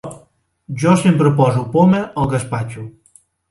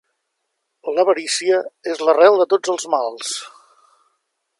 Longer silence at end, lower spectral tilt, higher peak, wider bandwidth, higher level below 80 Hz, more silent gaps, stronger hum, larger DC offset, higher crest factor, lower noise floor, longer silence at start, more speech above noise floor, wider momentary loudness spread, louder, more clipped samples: second, 0.6 s vs 1.1 s; first, -7.5 dB/octave vs -1.5 dB/octave; about the same, 0 dBFS vs 0 dBFS; about the same, 11.5 kHz vs 11.5 kHz; first, -46 dBFS vs -80 dBFS; neither; neither; neither; about the same, 16 dB vs 18 dB; second, -54 dBFS vs -75 dBFS; second, 0.05 s vs 0.85 s; second, 39 dB vs 58 dB; first, 19 LU vs 14 LU; first, -15 LUFS vs -18 LUFS; neither